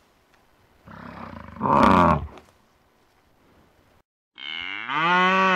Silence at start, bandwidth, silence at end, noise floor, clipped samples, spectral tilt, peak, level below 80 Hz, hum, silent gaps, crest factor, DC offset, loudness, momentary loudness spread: 0.85 s; 13.5 kHz; 0 s; -61 dBFS; under 0.1%; -6 dB/octave; -6 dBFS; -48 dBFS; none; 4.04-4.31 s; 18 dB; under 0.1%; -20 LUFS; 23 LU